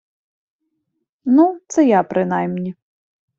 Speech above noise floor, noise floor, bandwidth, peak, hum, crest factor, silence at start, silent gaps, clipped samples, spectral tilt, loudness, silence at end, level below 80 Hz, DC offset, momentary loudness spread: 58 dB; -74 dBFS; 7.8 kHz; -2 dBFS; none; 16 dB; 1.25 s; none; under 0.1%; -7.5 dB/octave; -17 LUFS; 0.65 s; -64 dBFS; under 0.1%; 13 LU